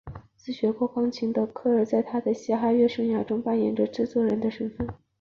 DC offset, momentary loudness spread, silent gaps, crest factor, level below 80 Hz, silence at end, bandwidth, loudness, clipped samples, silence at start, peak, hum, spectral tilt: under 0.1%; 10 LU; none; 14 dB; -56 dBFS; 0.25 s; 7 kHz; -26 LUFS; under 0.1%; 0.05 s; -12 dBFS; none; -7.5 dB/octave